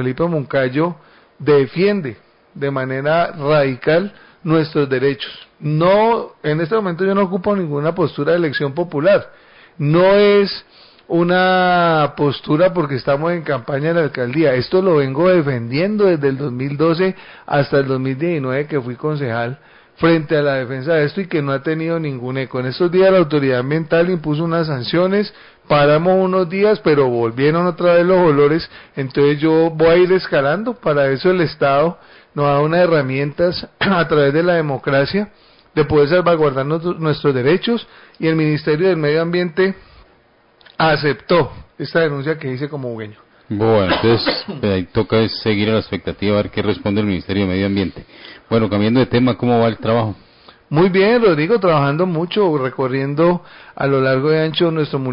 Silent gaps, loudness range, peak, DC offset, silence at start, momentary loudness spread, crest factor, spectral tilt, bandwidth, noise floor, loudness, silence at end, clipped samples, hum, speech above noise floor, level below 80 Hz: none; 4 LU; -4 dBFS; under 0.1%; 0 s; 9 LU; 12 dB; -11.5 dB/octave; 5.4 kHz; -53 dBFS; -16 LUFS; 0 s; under 0.1%; none; 38 dB; -46 dBFS